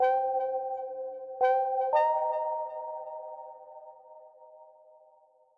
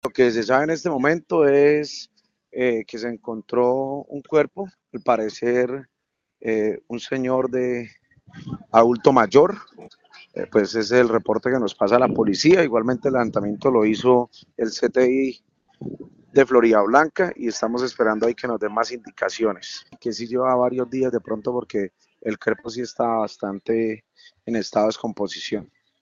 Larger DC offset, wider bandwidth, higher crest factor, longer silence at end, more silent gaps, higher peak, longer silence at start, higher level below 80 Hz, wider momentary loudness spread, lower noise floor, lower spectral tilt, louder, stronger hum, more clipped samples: neither; second, 5.8 kHz vs 7.6 kHz; about the same, 18 dB vs 20 dB; first, 0.85 s vs 0.35 s; neither; second, -14 dBFS vs 0 dBFS; about the same, 0 s vs 0.05 s; second, -86 dBFS vs -60 dBFS; first, 22 LU vs 16 LU; about the same, -63 dBFS vs -65 dBFS; about the same, -3.5 dB/octave vs -4.5 dB/octave; second, -30 LUFS vs -21 LUFS; neither; neither